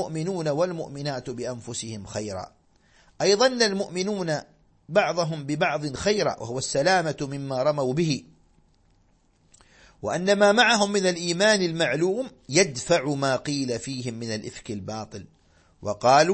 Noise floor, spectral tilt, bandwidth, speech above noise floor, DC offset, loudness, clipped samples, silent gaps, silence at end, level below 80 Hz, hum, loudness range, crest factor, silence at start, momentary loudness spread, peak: -63 dBFS; -4 dB/octave; 8.8 kHz; 38 dB; under 0.1%; -24 LUFS; under 0.1%; none; 0 s; -58 dBFS; none; 7 LU; 22 dB; 0 s; 14 LU; -4 dBFS